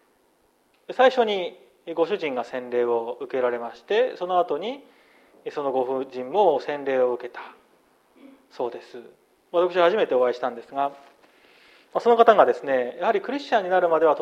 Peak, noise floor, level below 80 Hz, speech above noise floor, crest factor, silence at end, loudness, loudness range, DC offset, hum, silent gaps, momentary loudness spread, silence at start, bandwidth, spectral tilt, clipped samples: -2 dBFS; -64 dBFS; -78 dBFS; 41 dB; 22 dB; 0 s; -23 LUFS; 5 LU; under 0.1%; none; none; 15 LU; 0.9 s; 7.6 kHz; -5 dB/octave; under 0.1%